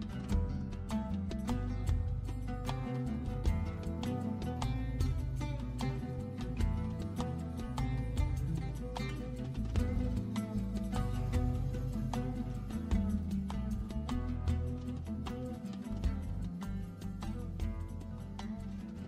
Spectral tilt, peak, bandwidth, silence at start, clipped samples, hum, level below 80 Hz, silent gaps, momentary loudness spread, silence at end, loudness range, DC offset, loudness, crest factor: -7.5 dB/octave; -20 dBFS; 14.5 kHz; 0 s; under 0.1%; none; -40 dBFS; none; 6 LU; 0 s; 3 LU; under 0.1%; -38 LUFS; 16 dB